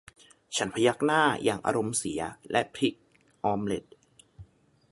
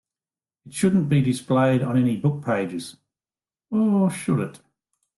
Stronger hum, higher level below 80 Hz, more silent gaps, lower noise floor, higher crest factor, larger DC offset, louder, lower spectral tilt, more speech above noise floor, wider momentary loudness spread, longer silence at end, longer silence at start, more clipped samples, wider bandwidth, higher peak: neither; about the same, -62 dBFS vs -60 dBFS; neither; second, -56 dBFS vs under -90 dBFS; first, 22 dB vs 16 dB; neither; second, -28 LUFS vs -22 LUFS; second, -4 dB/octave vs -7 dB/octave; second, 29 dB vs over 69 dB; about the same, 10 LU vs 12 LU; about the same, 0.5 s vs 0.6 s; second, 0.5 s vs 0.65 s; neither; about the same, 11.5 kHz vs 12.5 kHz; about the same, -8 dBFS vs -8 dBFS